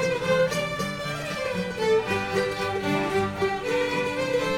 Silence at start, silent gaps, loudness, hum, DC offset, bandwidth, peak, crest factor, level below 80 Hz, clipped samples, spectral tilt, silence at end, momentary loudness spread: 0 s; none; -26 LUFS; none; under 0.1%; 16.5 kHz; -10 dBFS; 14 dB; -52 dBFS; under 0.1%; -4.5 dB/octave; 0 s; 6 LU